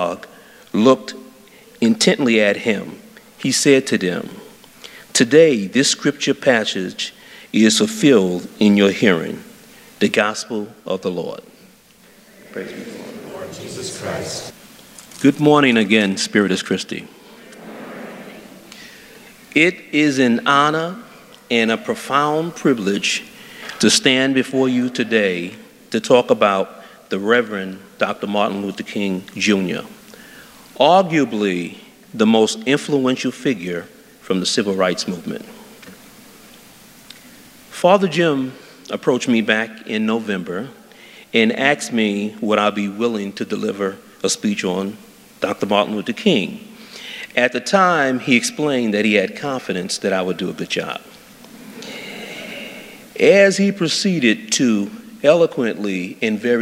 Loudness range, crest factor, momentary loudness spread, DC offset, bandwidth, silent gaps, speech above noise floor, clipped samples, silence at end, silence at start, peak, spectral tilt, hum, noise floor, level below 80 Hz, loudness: 7 LU; 18 dB; 19 LU; under 0.1%; 16 kHz; none; 32 dB; under 0.1%; 0 s; 0 s; 0 dBFS; -4 dB/octave; none; -49 dBFS; -64 dBFS; -17 LUFS